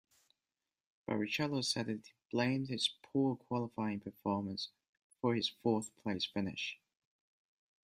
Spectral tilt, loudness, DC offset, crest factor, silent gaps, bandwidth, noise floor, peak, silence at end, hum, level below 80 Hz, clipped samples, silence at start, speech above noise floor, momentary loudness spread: -5 dB/octave; -37 LUFS; under 0.1%; 20 dB; 4.88-4.93 s, 5.02-5.10 s; 13 kHz; under -90 dBFS; -20 dBFS; 1.1 s; none; -76 dBFS; under 0.1%; 1.1 s; over 53 dB; 8 LU